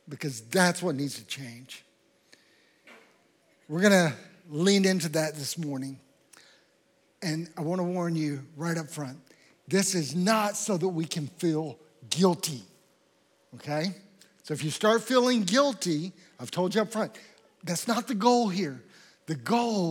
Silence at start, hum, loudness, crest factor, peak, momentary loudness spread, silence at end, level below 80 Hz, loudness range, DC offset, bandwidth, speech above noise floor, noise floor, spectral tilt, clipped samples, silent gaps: 0.05 s; none; -28 LUFS; 22 dB; -6 dBFS; 16 LU; 0 s; -90 dBFS; 6 LU; under 0.1%; 17.5 kHz; 39 dB; -67 dBFS; -4.5 dB/octave; under 0.1%; none